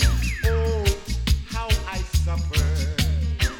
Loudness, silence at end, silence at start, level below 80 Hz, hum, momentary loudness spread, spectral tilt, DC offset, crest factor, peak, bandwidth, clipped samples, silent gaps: -24 LUFS; 0 s; 0 s; -24 dBFS; none; 3 LU; -4.5 dB/octave; under 0.1%; 14 dB; -8 dBFS; 17.5 kHz; under 0.1%; none